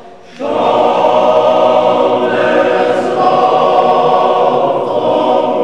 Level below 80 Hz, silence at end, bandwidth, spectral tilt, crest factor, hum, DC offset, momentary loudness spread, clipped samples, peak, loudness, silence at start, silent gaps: -56 dBFS; 0 s; 9.4 kHz; -5.5 dB/octave; 10 dB; none; 0.9%; 4 LU; under 0.1%; 0 dBFS; -11 LUFS; 0 s; none